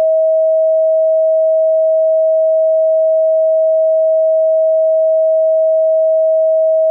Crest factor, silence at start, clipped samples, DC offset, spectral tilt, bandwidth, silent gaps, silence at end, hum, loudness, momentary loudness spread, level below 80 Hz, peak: 4 dB; 0 s; under 0.1%; under 0.1%; -7 dB/octave; 0.8 kHz; none; 0 s; none; -12 LUFS; 0 LU; under -90 dBFS; -8 dBFS